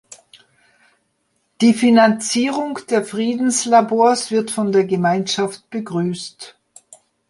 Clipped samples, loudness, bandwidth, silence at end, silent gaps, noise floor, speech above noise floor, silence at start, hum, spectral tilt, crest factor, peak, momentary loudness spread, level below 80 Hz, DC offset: under 0.1%; -17 LUFS; 11.5 kHz; 0.8 s; none; -67 dBFS; 51 dB; 1.6 s; none; -4.5 dB/octave; 16 dB; -2 dBFS; 12 LU; -66 dBFS; under 0.1%